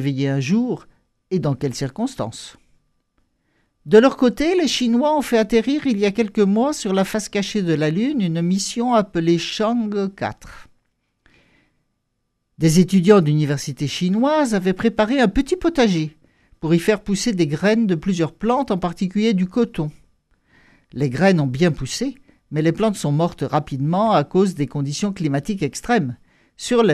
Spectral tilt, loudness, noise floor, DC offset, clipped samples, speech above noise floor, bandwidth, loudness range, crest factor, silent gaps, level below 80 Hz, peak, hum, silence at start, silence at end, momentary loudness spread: -6 dB/octave; -19 LUFS; -73 dBFS; under 0.1%; under 0.1%; 54 dB; 14 kHz; 5 LU; 20 dB; none; -44 dBFS; 0 dBFS; none; 0 s; 0 s; 9 LU